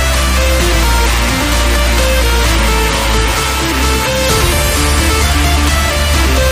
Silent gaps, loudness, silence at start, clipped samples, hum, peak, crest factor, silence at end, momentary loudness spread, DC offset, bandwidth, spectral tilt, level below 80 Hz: none; -12 LUFS; 0 s; under 0.1%; none; 0 dBFS; 10 dB; 0 s; 1 LU; under 0.1%; 15.5 kHz; -3.5 dB/octave; -14 dBFS